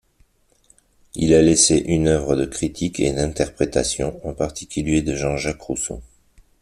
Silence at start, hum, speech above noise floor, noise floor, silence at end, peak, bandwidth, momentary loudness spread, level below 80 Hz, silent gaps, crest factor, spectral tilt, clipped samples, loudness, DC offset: 1.15 s; none; 39 dB; -59 dBFS; 0.6 s; -2 dBFS; 13 kHz; 12 LU; -38 dBFS; none; 20 dB; -4.5 dB/octave; under 0.1%; -20 LUFS; under 0.1%